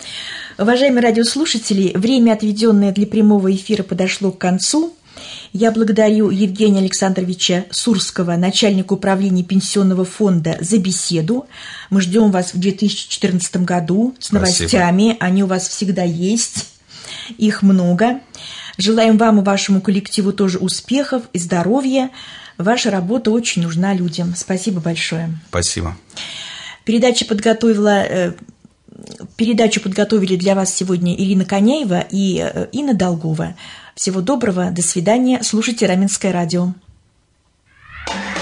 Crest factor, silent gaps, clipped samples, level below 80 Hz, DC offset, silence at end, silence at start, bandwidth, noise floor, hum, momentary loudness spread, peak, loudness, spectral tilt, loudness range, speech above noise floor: 14 dB; none; under 0.1%; -52 dBFS; under 0.1%; 0 s; 0 s; 11 kHz; -59 dBFS; none; 13 LU; -2 dBFS; -16 LUFS; -5 dB/octave; 3 LU; 43 dB